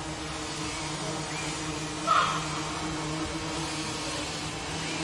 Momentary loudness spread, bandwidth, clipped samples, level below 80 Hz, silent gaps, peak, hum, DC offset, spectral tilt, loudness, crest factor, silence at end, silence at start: 8 LU; 11.5 kHz; under 0.1%; -50 dBFS; none; -12 dBFS; none; under 0.1%; -3 dB/octave; -31 LUFS; 20 dB; 0 s; 0 s